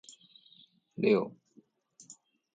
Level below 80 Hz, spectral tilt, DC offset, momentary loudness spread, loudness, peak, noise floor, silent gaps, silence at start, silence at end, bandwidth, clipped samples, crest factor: -82 dBFS; -6 dB/octave; under 0.1%; 25 LU; -30 LUFS; -14 dBFS; -65 dBFS; none; 1 s; 1.25 s; 9.2 kHz; under 0.1%; 22 dB